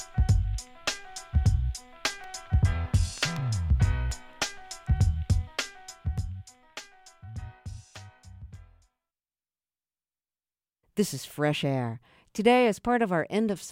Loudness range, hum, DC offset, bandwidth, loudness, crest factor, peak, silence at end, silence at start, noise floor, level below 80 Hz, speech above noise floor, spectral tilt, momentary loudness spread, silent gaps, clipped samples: 19 LU; 60 Hz at -50 dBFS; under 0.1%; 16.5 kHz; -28 LUFS; 20 dB; -8 dBFS; 0 s; 0 s; under -90 dBFS; -34 dBFS; over 64 dB; -5.5 dB/octave; 18 LU; none; under 0.1%